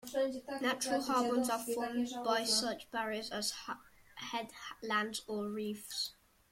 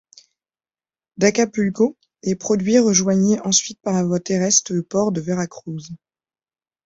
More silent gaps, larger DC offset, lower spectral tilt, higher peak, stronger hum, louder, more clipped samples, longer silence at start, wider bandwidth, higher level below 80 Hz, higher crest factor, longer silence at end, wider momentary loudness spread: neither; neither; second, -2.5 dB/octave vs -4 dB/octave; second, -20 dBFS vs -2 dBFS; neither; second, -36 LUFS vs -19 LUFS; neither; second, 0.05 s vs 1.2 s; first, 16.5 kHz vs 8 kHz; second, -72 dBFS vs -58 dBFS; about the same, 18 dB vs 18 dB; second, 0.4 s vs 0.9 s; about the same, 12 LU vs 12 LU